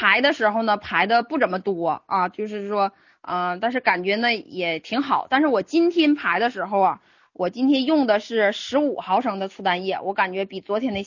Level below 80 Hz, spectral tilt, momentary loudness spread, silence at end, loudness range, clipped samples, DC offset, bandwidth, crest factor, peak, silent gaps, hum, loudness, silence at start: -64 dBFS; -5 dB/octave; 7 LU; 0 s; 3 LU; under 0.1%; under 0.1%; 7.4 kHz; 20 dB; -2 dBFS; none; none; -22 LUFS; 0 s